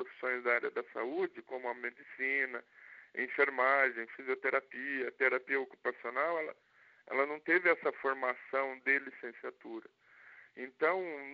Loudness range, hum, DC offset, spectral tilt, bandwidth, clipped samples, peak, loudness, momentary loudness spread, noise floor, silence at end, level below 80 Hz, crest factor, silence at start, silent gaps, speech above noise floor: 4 LU; none; under 0.1%; -1 dB/octave; 5.2 kHz; under 0.1%; -14 dBFS; -34 LUFS; 16 LU; -59 dBFS; 0 s; under -90 dBFS; 22 dB; 0 s; none; 24 dB